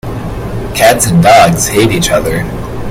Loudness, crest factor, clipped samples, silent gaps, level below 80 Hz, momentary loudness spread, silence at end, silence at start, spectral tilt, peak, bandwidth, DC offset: -8 LUFS; 10 dB; 1%; none; -26 dBFS; 15 LU; 0 s; 0.05 s; -4.5 dB/octave; 0 dBFS; 17 kHz; under 0.1%